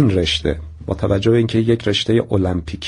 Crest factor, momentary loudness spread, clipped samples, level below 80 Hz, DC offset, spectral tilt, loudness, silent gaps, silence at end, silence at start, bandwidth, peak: 14 dB; 8 LU; under 0.1%; -34 dBFS; under 0.1%; -6.5 dB/octave; -18 LUFS; none; 0 s; 0 s; 10.5 kHz; -2 dBFS